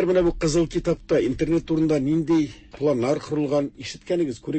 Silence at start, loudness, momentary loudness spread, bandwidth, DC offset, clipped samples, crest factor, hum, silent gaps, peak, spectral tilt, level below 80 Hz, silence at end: 0 s; -23 LUFS; 5 LU; 8.6 kHz; under 0.1%; under 0.1%; 14 dB; none; none; -10 dBFS; -6.5 dB/octave; -42 dBFS; 0 s